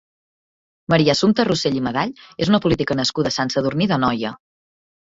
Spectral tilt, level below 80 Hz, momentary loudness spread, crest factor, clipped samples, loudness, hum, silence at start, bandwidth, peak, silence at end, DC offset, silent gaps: -5.5 dB/octave; -50 dBFS; 9 LU; 18 dB; under 0.1%; -19 LUFS; none; 0.9 s; 7.8 kHz; -2 dBFS; 0.65 s; under 0.1%; none